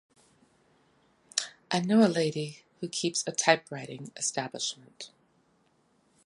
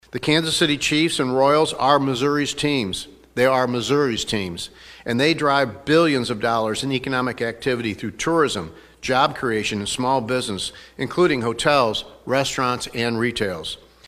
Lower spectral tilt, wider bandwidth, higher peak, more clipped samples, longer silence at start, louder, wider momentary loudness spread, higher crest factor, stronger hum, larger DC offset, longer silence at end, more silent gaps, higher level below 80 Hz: about the same, -3.5 dB/octave vs -4 dB/octave; second, 11.5 kHz vs 15 kHz; second, -6 dBFS vs -2 dBFS; neither; first, 1.35 s vs 0.15 s; second, -29 LUFS vs -21 LUFS; first, 18 LU vs 10 LU; first, 26 dB vs 18 dB; neither; neither; first, 1.2 s vs 0.3 s; neither; second, -78 dBFS vs -50 dBFS